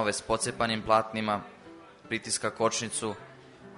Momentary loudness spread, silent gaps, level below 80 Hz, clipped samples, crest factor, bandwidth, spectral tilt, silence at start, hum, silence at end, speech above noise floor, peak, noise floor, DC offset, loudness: 21 LU; none; -60 dBFS; under 0.1%; 22 dB; 11 kHz; -3 dB/octave; 0 s; none; 0 s; 21 dB; -10 dBFS; -51 dBFS; under 0.1%; -29 LUFS